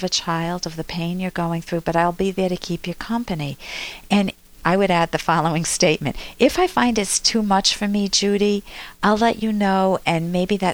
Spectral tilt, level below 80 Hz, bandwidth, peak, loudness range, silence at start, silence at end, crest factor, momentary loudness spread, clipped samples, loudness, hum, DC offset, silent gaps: -4 dB/octave; -44 dBFS; over 20 kHz; -2 dBFS; 5 LU; 0 s; 0 s; 18 dB; 10 LU; under 0.1%; -20 LUFS; none; under 0.1%; none